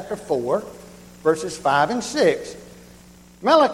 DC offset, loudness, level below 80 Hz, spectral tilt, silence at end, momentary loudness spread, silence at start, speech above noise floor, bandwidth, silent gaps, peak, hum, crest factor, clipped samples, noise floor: under 0.1%; -21 LUFS; -56 dBFS; -4 dB/octave; 0 s; 19 LU; 0 s; 27 dB; 16 kHz; none; -2 dBFS; 60 Hz at -50 dBFS; 20 dB; under 0.1%; -47 dBFS